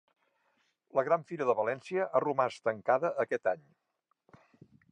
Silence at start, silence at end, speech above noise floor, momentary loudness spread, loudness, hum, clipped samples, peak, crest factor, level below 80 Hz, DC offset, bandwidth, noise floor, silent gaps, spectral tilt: 0.95 s; 1.3 s; 44 dB; 5 LU; -31 LUFS; none; under 0.1%; -14 dBFS; 20 dB; -84 dBFS; under 0.1%; 9.6 kHz; -75 dBFS; none; -6.5 dB/octave